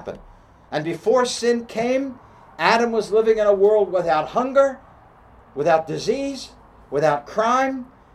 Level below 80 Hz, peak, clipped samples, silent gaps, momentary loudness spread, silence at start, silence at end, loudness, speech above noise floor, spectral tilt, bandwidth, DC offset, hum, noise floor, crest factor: -54 dBFS; -2 dBFS; under 0.1%; none; 13 LU; 0 s; 0.3 s; -20 LUFS; 29 dB; -4.5 dB/octave; 12 kHz; under 0.1%; none; -49 dBFS; 20 dB